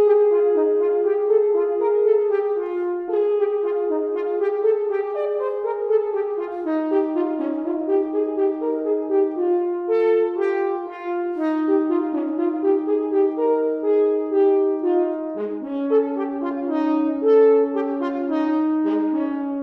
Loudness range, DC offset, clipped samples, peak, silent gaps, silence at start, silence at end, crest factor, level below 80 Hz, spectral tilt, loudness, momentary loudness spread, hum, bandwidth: 3 LU; under 0.1%; under 0.1%; -8 dBFS; none; 0 s; 0 s; 12 dB; -68 dBFS; -7.5 dB/octave; -21 LUFS; 7 LU; none; 4.3 kHz